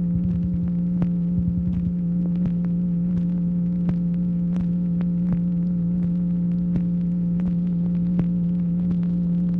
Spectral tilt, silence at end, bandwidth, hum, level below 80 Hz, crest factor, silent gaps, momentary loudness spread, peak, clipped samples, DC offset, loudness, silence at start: -12.5 dB/octave; 0 s; 2.2 kHz; none; -40 dBFS; 12 dB; none; 1 LU; -10 dBFS; under 0.1%; under 0.1%; -23 LUFS; 0 s